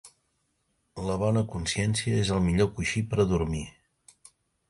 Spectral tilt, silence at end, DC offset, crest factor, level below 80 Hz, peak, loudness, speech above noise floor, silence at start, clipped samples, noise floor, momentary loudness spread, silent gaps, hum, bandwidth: -5.5 dB/octave; 1 s; under 0.1%; 18 dB; -44 dBFS; -12 dBFS; -27 LUFS; 48 dB; 0.05 s; under 0.1%; -74 dBFS; 10 LU; none; none; 11.5 kHz